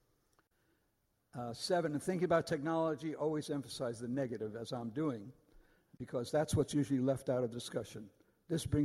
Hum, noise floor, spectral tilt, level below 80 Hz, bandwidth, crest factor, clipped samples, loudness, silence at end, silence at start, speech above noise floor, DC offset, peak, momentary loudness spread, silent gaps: none; -79 dBFS; -6 dB/octave; -64 dBFS; 13.5 kHz; 20 dB; under 0.1%; -37 LUFS; 0 s; 1.35 s; 43 dB; under 0.1%; -18 dBFS; 12 LU; none